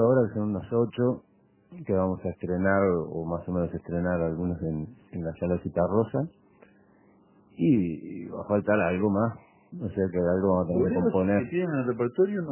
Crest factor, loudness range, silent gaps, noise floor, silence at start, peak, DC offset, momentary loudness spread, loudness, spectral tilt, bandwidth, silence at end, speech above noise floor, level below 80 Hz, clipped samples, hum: 16 dB; 3 LU; none; -59 dBFS; 0 s; -10 dBFS; under 0.1%; 12 LU; -27 LUFS; -12.5 dB/octave; 3.2 kHz; 0 s; 33 dB; -48 dBFS; under 0.1%; none